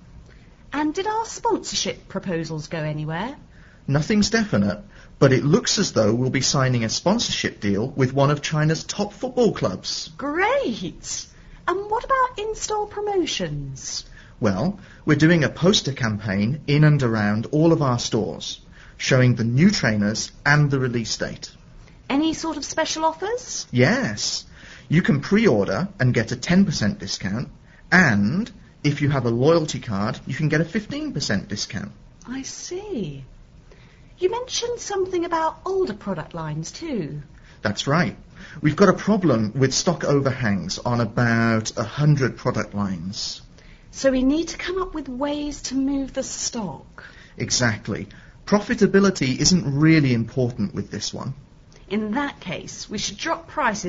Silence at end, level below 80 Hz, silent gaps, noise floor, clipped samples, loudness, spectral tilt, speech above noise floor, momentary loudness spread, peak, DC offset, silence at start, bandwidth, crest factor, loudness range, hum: 0 s; -46 dBFS; none; -47 dBFS; under 0.1%; -22 LUFS; -5 dB/octave; 26 dB; 13 LU; -2 dBFS; under 0.1%; 0.15 s; 8 kHz; 20 dB; 6 LU; none